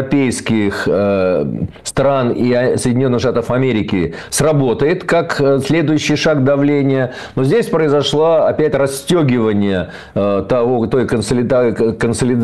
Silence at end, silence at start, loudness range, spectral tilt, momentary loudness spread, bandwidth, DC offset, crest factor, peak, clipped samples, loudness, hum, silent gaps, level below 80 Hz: 0 s; 0 s; 1 LU; -6 dB/octave; 5 LU; 12.5 kHz; 0.7%; 8 dB; -6 dBFS; under 0.1%; -15 LUFS; none; none; -42 dBFS